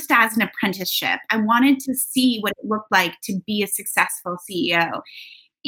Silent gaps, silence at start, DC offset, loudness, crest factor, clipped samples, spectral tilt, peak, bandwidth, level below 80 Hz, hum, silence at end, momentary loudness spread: none; 0 s; under 0.1%; -20 LUFS; 20 dB; under 0.1%; -3 dB/octave; -2 dBFS; 18 kHz; -66 dBFS; none; 0 s; 11 LU